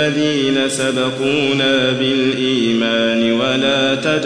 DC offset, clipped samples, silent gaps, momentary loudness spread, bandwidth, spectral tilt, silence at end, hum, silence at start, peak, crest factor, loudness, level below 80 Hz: 0.3%; under 0.1%; none; 2 LU; 10.5 kHz; -4 dB/octave; 0 s; none; 0 s; -2 dBFS; 12 dB; -15 LUFS; -58 dBFS